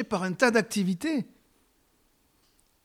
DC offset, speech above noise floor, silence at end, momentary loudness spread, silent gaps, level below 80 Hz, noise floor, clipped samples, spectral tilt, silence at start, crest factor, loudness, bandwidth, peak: under 0.1%; 41 dB; 1.6 s; 9 LU; none; -68 dBFS; -67 dBFS; under 0.1%; -5 dB/octave; 0 s; 24 dB; -26 LUFS; 16 kHz; -6 dBFS